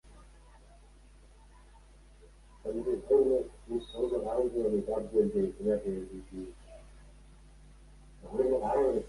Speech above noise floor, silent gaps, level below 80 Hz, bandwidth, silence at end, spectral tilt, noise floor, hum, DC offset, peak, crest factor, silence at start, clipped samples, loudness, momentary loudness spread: 26 dB; none; -54 dBFS; 11.5 kHz; 0 s; -7.5 dB/octave; -56 dBFS; none; under 0.1%; -14 dBFS; 18 dB; 0.05 s; under 0.1%; -31 LUFS; 17 LU